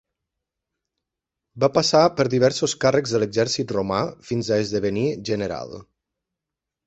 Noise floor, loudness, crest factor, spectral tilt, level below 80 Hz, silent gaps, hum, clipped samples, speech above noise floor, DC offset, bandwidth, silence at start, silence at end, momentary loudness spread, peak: -86 dBFS; -21 LUFS; 20 dB; -5 dB/octave; -56 dBFS; none; none; under 0.1%; 65 dB; under 0.1%; 8.2 kHz; 1.55 s; 1.05 s; 10 LU; -2 dBFS